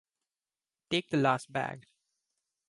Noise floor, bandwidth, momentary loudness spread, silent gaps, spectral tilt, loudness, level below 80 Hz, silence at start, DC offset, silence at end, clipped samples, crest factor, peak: under -90 dBFS; 11.5 kHz; 11 LU; none; -5.5 dB/octave; -31 LUFS; -72 dBFS; 0.9 s; under 0.1%; 0.9 s; under 0.1%; 22 dB; -12 dBFS